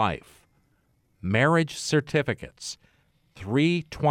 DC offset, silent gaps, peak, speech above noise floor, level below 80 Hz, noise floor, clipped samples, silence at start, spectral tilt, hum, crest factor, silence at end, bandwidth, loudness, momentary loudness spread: under 0.1%; none; -10 dBFS; 42 dB; -54 dBFS; -67 dBFS; under 0.1%; 0 s; -5.5 dB/octave; none; 16 dB; 0 s; 15 kHz; -25 LUFS; 16 LU